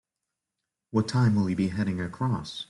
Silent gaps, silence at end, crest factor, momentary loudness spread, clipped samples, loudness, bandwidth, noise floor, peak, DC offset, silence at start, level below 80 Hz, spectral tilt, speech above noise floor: none; 0.05 s; 16 dB; 6 LU; under 0.1%; -27 LUFS; 11.5 kHz; -86 dBFS; -12 dBFS; under 0.1%; 0.95 s; -58 dBFS; -7 dB/octave; 60 dB